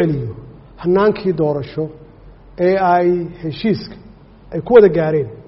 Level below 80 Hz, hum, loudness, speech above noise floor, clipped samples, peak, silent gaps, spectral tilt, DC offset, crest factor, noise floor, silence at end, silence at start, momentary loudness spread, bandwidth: -44 dBFS; none; -16 LUFS; 26 dB; under 0.1%; 0 dBFS; none; -6.5 dB/octave; under 0.1%; 16 dB; -41 dBFS; 0.05 s; 0 s; 17 LU; 5.8 kHz